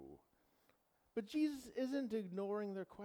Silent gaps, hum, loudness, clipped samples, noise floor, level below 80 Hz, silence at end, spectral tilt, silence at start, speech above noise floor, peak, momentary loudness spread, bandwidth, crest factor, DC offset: none; none; -43 LUFS; under 0.1%; -78 dBFS; -80 dBFS; 0 s; -6.5 dB/octave; 0 s; 36 dB; -28 dBFS; 8 LU; 20 kHz; 16 dB; under 0.1%